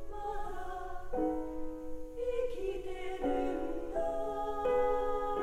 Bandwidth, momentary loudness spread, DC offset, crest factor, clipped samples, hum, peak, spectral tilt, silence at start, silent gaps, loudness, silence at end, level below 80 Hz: 12 kHz; 11 LU; under 0.1%; 14 dB; under 0.1%; none; -20 dBFS; -6.5 dB/octave; 0 s; none; -37 LUFS; 0 s; -44 dBFS